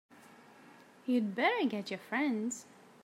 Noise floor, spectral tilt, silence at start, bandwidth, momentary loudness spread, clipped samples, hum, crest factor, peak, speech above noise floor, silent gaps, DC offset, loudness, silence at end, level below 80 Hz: -58 dBFS; -4 dB/octave; 0.7 s; 14.5 kHz; 11 LU; under 0.1%; none; 20 dB; -14 dBFS; 25 dB; none; under 0.1%; -34 LUFS; 0.4 s; -90 dBFS